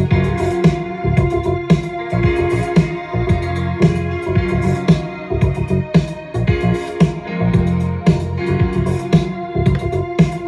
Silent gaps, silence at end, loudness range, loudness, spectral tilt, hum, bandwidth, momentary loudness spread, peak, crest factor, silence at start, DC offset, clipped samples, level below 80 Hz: none; 0 s; 1 LU; -17 LUFS; -8 dB/octave; none; 10.5 kHz; 4 LU; -2 dBFS; 14 dB; 0 s; under 0.1%; under 0.1%; -30 dBFS